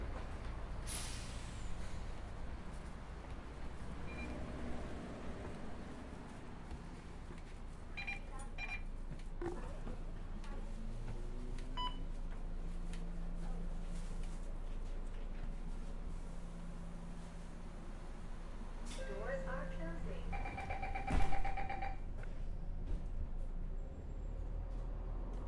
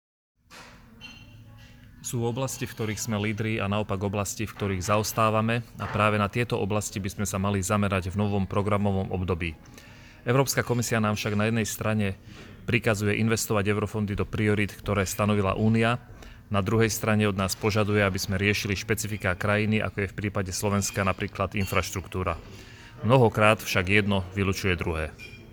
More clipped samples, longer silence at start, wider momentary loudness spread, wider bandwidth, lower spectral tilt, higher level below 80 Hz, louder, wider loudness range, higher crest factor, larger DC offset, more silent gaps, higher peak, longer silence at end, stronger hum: neither; second, 0 s vs 0.5 s; about the same, 8 LU vs 9 LU; second, 11.5 kHz vs over 20 kHz; about the same, -5.5 dB/octave vs -5 dB/octave; about the same, -44 dBFS vs -48 dBFS; second, -48 LUFS vs -26 LUFS; about the same, 6 LU vs 4 LU; about the same, 22 dB vs 22 dB; neither; neither; second, -20 dBFS vs -4 dBFS; about the same, 0 s vs 0 s; neither